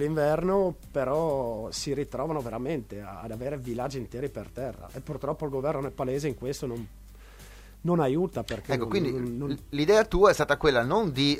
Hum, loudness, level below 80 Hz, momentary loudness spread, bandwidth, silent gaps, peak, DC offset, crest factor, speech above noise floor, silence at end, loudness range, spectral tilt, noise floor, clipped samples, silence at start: none; -28 LUFS; -46 dBFS; 14 LU; 16 kHz; none; -8 dBFS; under 0.1%; 20 dB; 20 dB; 0 s; 9 LU; -5.5 dB/octave; -48 dBFS; under 0.1%; 0 s